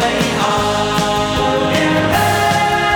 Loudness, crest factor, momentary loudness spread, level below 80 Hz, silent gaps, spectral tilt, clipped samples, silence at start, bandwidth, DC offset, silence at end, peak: -14 LUFS; 14 dB; 2 LU; -36 dBFS; none; -4 dB/octave; under 0.1%; 0 s; over 20 kHz; 0.1%; 0 s; 0 dBFS